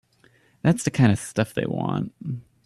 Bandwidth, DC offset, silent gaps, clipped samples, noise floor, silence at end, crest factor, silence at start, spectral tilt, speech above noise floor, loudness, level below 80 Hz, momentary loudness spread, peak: 13.5 kHz; under 0.1%; none; under 0.1%; -59 dBFS; 0.25 s; 18 dB; 0.65 s; -6.5 dB/octave; 37 dB; -24 LUFS; -56 dBFS; 12 LU; -6 dBFS